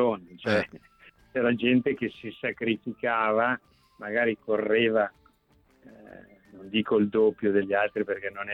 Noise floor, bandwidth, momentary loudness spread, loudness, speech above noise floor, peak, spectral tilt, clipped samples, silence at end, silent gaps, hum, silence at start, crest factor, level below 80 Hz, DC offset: -64 dBFS; 9 kHz; 10 LU; -27 LUFS; 37 dB; -10 dBFS; -7 dB/octave; under 0.1%; 0 s; none; none; 0 s; 16 dB; -66 dBFS; under 0.1%